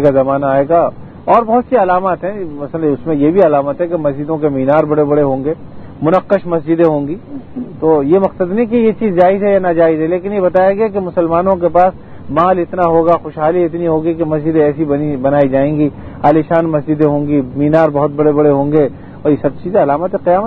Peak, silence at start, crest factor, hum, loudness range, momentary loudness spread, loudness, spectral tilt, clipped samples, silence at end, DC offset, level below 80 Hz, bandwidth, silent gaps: 0 dBFS; 0 s; 12 dB; none; 2 LU; 7 LU; -13 LUFS; -10.5 dB/octave; 0.1%; 0 s; under 0.1%; -42 dBFS; 4.7 kHz; none